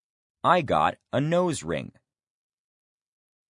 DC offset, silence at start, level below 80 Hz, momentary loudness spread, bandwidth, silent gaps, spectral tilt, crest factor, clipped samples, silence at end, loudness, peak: under 0.1%; 0.45 s; -62 dBFS; 11 LU; 11 kHz; none; -5.5 dB/octave; 22 dB; under 0.1%; 1.6 s; -25 LUFS; -6 dBFS